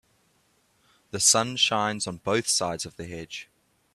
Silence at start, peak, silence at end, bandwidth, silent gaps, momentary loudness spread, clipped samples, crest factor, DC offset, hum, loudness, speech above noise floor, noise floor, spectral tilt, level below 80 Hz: 1.15 s; -6 dBFS; 0.5 s; 15 kHz; none; 18 LU; under 0.1%; 22 dB; under 0.1%; none; -23 LUFS; 41 dB; -67 dBFS; -1.5 dB/octave; -64 dBFS